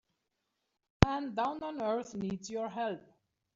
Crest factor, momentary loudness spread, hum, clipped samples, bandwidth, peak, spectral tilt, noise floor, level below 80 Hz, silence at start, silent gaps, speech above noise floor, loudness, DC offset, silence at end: 36 dB; 9 LU; none; under 0.1%; 7.8 kHz; 0 dBFS; -6 dB/octave; -84 dBFS; -48 dBFS; 1 s; none; 48 dB; -34 LUFS; under 0.1%; 0.55 s